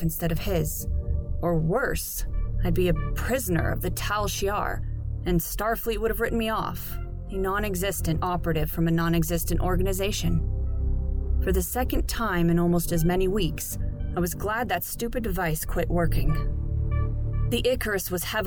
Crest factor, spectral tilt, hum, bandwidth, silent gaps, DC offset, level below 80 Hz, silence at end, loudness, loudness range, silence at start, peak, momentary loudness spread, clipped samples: 14 dB; -5.5 dB/octave; none; 19.5 kHz; none; under 0.1%; -30 dBFS; 0 s; -27 LUFS; 2 LU; 0 s; -10 dBFS; 6 LU; under 0.1%